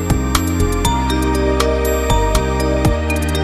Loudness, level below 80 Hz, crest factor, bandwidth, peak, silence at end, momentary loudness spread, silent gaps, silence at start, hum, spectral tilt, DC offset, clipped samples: -17 LUFS; -20 dBFS; 14 dB; 14 kHz; 0 dBFS; 0 s; 2 LU; none; 0 s; none; -5 dB/octave; under 0.1%; under 0.1%